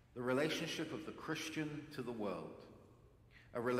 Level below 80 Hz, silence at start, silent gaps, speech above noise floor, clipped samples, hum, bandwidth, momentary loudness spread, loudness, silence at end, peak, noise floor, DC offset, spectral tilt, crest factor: -72 dBFS; 0.1 s; none; 23 dB; under 0.1%; none; 16.5 kHz; 17 LU; -42 LUFS; 0 s; -24 dBFS; -65 dBFS; under 0.1%; -4.5 dB/octave; 20 dB